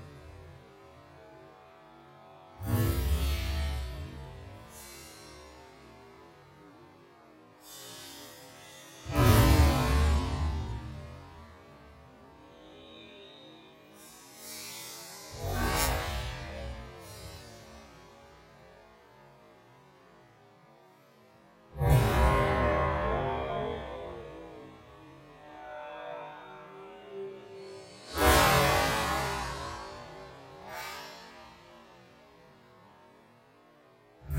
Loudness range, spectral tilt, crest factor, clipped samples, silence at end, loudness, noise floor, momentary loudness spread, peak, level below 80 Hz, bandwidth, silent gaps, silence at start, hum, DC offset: 21 LU; -5 dB/octave; 24 dB; under 0.1%; 0 s; -30 LUFS; -60 dBFS; 27 LU; -10 dBFS; -38 dBFS; 16 kHz; none; 0 s; none; under 0.1%